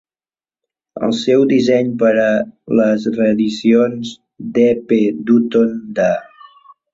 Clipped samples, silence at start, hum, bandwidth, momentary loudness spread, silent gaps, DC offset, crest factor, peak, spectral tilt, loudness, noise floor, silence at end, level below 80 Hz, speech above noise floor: under 0.1%; 0.95 s; none; 7.8 kHz; 9 LU; none; under 0.1%; 14 dB; -2 dBFS; -6.5 dB/octave; -15 LUFS; under -90 dBFS; 0.7 s; -58 dBFS; over 76 dB